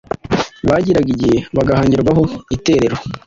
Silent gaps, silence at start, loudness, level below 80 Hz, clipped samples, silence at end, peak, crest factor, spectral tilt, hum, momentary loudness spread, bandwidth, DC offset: none; 0.25 s; -15 LUFS; -36 dBFS; under 0.1%; 0.1 s; -2 dBFS; 14 dB; -7 dB/octave; none; 6 LU; 7.8 kHz; under 0.1%